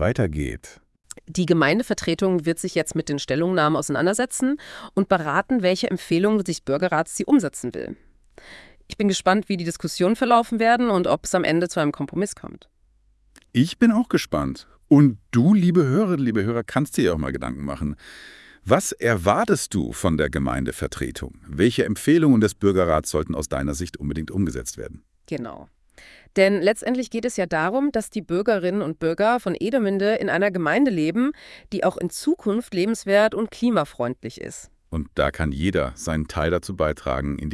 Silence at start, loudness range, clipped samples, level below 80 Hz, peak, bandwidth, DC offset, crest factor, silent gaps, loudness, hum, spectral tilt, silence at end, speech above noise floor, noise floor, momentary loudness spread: 0 s; 5 LU; under 0.1%; -44 dBFS; -2 dBFS; 12 kHz; under 0.1%; 20 dB; none; -22 LUFS; none; -5.5 dB/octave; 0 s; 39 dB; -60 dBFS; 13 LU